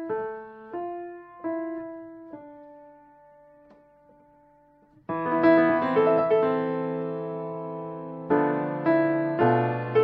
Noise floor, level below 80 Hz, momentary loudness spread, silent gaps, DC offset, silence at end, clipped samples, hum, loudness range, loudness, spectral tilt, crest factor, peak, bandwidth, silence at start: -59 dBFS; -70 dBFS; 20 LU; none; under 0.1%; 0 s; under 0.1%; none; 15 LU; -25 LUFS; -6.5 dB/octave; 18 dB; -8 dBFS; 5.4 kHz; 0 s